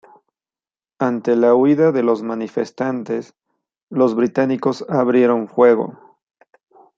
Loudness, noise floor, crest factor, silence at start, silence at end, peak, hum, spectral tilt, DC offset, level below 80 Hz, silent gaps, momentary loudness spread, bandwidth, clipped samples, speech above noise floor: -17 LUFS; under -90 dBFS; 16 dB; 1 s; 1.05 s; -2 dBFS; none; -8 dB/octave; under 0.1%; -68 dBFS; 3.83-3.87 s; 11 LU; 7.4 kHz; under 0.1%; over 74 dB